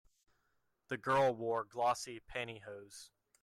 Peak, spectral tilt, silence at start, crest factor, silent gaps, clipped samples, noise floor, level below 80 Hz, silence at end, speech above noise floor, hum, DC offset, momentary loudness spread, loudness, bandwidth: -22 dBFS; -4.5 dB/octave; 0.9 s; 16 dB; none; under 0.1%; -80 dBFS; -70 dBFS; 0.35 s; 43 dB; none; under 0.1%; 19 LU; -37 LUFS; 13.5 kHz